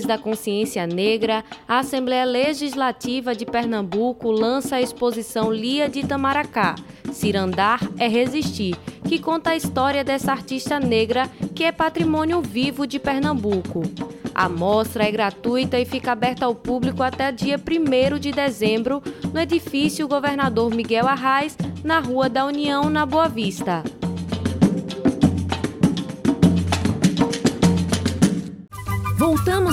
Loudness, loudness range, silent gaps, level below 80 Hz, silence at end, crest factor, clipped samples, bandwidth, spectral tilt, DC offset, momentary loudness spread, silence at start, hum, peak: -21 LUFS; 2 LU; none; -46 dBFS; 0 s; 16 dB; under 0.1%; 16.5 kHz; -5.5 dB/octave; under 0.1%; 6 LU; 0 s; none; -4 dBFS